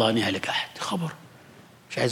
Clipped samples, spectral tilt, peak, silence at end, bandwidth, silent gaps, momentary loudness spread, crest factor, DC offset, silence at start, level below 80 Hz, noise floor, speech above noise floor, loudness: under 0.1%; -4.5 dB/octave; -8 dBFS; 0 s; 17.5 kHz; none; 11 LU; 20 dB; under 0.1%; 0 s; -72 dBFS; -51 dBFS; 25 dB; -28 LUFS